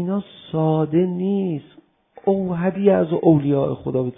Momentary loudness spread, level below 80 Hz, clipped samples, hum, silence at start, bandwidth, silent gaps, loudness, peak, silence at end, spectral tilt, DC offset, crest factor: 10 LU; -54 dBFS; under 0.1%; none; 0 s; 3.8 kHz; none; -20 LUFS; -2 dBFS; 0.05 s; -13.5 dB/octave; under 0.1%; 16 dB